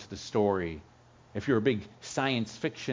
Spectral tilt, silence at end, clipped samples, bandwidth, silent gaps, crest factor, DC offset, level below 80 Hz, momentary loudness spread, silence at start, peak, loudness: -5.5 dB/octave; 0 s; under 0.1%; 7.6 kHz; none; 18 dB; under 0.1%; -56 dBFS; 10 LU; 0 s; -12 dBFS; -31 LUFS